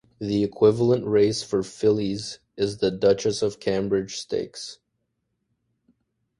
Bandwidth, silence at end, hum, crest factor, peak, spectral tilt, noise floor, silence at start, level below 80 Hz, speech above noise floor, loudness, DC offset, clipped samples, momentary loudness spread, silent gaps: 11.5 kHz; 1.65 s; none; 18 dB; -6 dBFS; -5.5 dB/octave; -76 dBFS; 0.2 s; -56 dBFS; 53 dB; -23 LUFS; under 0.1%; under 0.1%; 11 LU; none